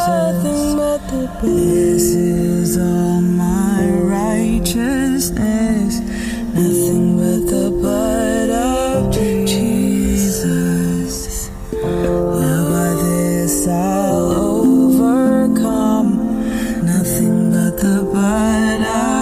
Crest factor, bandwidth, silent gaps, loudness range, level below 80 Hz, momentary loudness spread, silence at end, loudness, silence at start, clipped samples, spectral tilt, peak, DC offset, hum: 12 dB; 16 kHz; none; 3 LU; -32 dBFS; 5 LU; 0 s; -16 LUFS; 0 s; under 0.1%; -6 dB/octave; -4 dBFS; under 0.1%; none